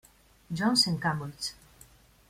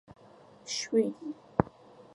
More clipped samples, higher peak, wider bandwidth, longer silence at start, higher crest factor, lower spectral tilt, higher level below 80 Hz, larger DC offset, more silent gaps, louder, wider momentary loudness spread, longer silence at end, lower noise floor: neither; second, -10 dBFS vs -4 dBFS; first, 16 kHz vs 11.5 kHz; first, 0.5 s vs 0.1 s; second, 22 dB vs 30 dB; second, -3.5 dB/octave vs -5 dB/octave; about the same, -60 dBFS vs -58 dBFS; neither; neither; first, -28 LUFS vs -32 LUFS; about the same, 13 LU vs 13 LU; first, 0.75 s vs 0.45 s; about the same, -57 dBFS vs -56 dBFS